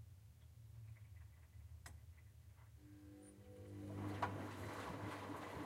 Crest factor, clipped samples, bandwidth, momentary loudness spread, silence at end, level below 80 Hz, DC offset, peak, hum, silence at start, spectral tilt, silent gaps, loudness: 26 dB; under 0.1%; 16 kHz; 18 LU; 0 s; -66 dBFS; under 0.1%; -26 dBFS; none; 0 s; -6 dB/octave; none; -52 LUFS